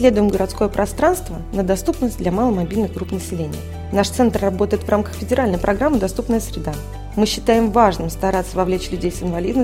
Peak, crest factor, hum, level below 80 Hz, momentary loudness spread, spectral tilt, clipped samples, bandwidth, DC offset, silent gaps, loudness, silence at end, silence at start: 0 dBFS; 18 dB; none; -32 dBFS; 10 LU; -6 dB/octave; under 0.1%; 16.5 kHz; 0.3%; none; -19 LUFS; 0 s; 0 s